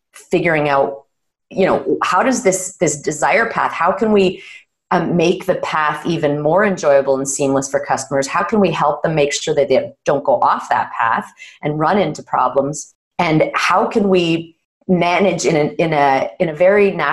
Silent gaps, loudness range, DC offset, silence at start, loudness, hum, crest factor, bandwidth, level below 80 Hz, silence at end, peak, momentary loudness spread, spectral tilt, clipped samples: 12.95-13.11 s, 14.65-14.81 s; 2 LU; under 0.1%; 0.15 s; -16 LUFS; none; 12 dB; 12.5 kHz; -52 dBFS; 0 s; -4 dBFS; 6 LU; -4.5 dB/octave; under 0.1%